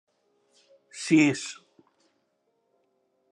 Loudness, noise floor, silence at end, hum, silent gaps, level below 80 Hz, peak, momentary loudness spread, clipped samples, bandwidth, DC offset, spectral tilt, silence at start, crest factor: -24 LUFS; -74 dBFS; 1.75 s; none; none; -82 dBFS; -8 dBFS; 25 LU; under 0.1%; 10.5 kHz; under 0.1%; -4.5 dB/octave; 0.95 s; 22 dB